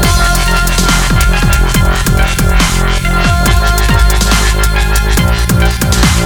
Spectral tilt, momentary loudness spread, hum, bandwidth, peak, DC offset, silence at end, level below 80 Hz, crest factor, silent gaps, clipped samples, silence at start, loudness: -4 dB/octave; 2 LU; none; 20 kHz; 0 dBFS; under 0.1%; 0 s; -12 dBFS; 8 dB; none; 0.2%; 0 s; -10 LUFS